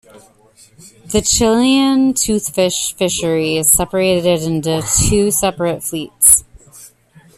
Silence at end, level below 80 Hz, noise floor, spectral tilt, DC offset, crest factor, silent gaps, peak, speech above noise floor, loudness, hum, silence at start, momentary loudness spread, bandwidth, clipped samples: 0.5 s; -36 dBFS; -47 dBFS; -3.5 dB/octave; under 0.1%; 16 dB; none; 0 dBFS; 32 dB; -14 LUFS; none; 0.15 s; 7 LU; 15.5 kHz; under 0.1%